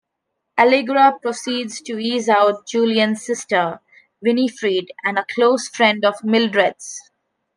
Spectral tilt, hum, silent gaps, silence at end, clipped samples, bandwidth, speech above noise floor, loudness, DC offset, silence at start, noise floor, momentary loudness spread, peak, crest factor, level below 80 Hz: -3.5 dB/octave; none; none; 0.55 s; under 0.1%; 10.5 kHz; 59 dB; -18 LUFS; under 0.1%; 0.55 s; -77 dBFS; 10 LU; -2 dBFS; 16 dB; -72 dBFS